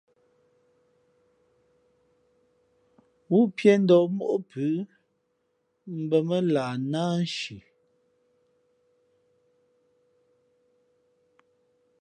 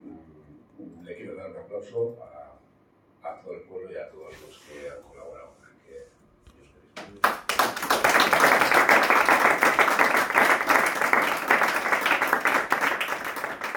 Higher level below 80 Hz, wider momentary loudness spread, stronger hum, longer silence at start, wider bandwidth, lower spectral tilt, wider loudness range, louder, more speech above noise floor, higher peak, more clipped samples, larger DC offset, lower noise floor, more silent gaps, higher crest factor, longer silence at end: second, -76 dBFS vs -62 dBFS; second, 15 LU vs 23 LU; neither; first, 3.3 s vs 0.05 s; second, 10 kHz vs 19.5 kHz; first, -7 dB/octave vs -2 dB/octave; second, 9 LU vs 23 LU; second, -25 LUFS vs -21 LUFS; first, 50 dB vs 24 dB; about the same, -6 dBFS vs -4 dBFS; neither; neither; first, -74 dBFS vs -61 dBFS; neither; about the same, 24 dB vs 22 dB; first, 4.4 s vs 0 s